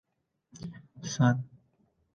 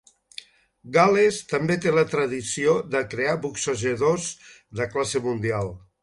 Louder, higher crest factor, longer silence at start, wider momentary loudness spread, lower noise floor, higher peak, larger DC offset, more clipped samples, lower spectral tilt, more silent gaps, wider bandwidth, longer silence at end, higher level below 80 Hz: second, -29 LUFS vs -23 LUFS; about the same, 22 dB vs 18 dB; second, 0.55 s vs 0.85 s; first, 19 LU vs 16 LU; first, -71 dBFS vs -46 dBFS; second, -10 dBFS vs -6 dBFS; neither; neither; first, -6 dB/octave vs -4.5 dB/octave; neither; second, 7.2 kHz vs 11.5 kHz; first, 0.7 s vs 0.25 s; second, -66 dBFS vs -56 dBFS